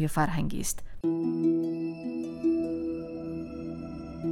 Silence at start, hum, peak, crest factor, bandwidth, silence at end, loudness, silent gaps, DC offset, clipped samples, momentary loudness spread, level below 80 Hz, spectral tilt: 0 s; none; -14 dBFS; 16 dB; 16 kHz; 0 s; -31 LUFS; none; under 0.1%; under 0.1%; 11 LU; -46 dBFS; -6 dB/octave